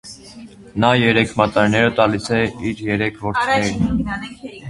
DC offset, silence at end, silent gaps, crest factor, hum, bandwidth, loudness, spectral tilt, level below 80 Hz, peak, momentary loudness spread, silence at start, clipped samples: under 0.1%; 0 s; none; 18 dB; none; 11.5 kHz; -18 LUFS; -5.5 dB/octave; -40 dBFS; 0 dBFS; 13 LU; 0.05 s; under 0.1%